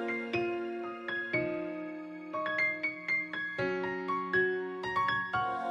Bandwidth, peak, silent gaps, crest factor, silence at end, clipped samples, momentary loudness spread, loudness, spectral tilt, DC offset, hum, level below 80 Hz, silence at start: 7.6 kHz; -18 dBFS; none; 16 dB; 0 s; under 0.1%; 9 LU; -33 LUFS; -6 dB/octave; under 0.1%; none; -68 dBFS; 0 s